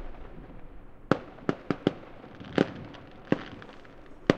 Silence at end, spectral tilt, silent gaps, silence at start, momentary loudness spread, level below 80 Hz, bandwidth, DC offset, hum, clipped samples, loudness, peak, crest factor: 0 s; -7 dB/octave; none; 0 s; 21 LU; -50 dBFS; 9 kHz; under 0.1%; none; under 0.1%; -31 LUFS; 0 dBFS; 32 dB